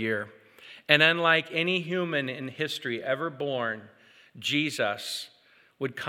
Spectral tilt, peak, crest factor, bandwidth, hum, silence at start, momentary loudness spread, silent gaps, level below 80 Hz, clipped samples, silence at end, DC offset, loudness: -4 dB/octave; -4 dBFS; 26 dB; 17.5 kHz; none; 0 s; 16 LU; none; -84 dBFS; under 0.1%; 0 s; under 0.1%; -27 LUFS